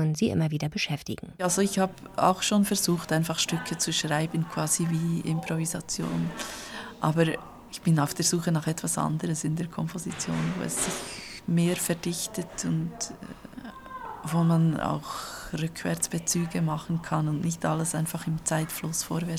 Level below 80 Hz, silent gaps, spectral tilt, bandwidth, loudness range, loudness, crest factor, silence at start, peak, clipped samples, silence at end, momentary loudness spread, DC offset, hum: -56 dBFS; none; -4.5 dB/octave; 16 kHz; 4 LU; -28 LUFS; 20 dB; 0 s; -8 dBFS; under 0.1%; 0 s; 11 LU; under 0.1%; none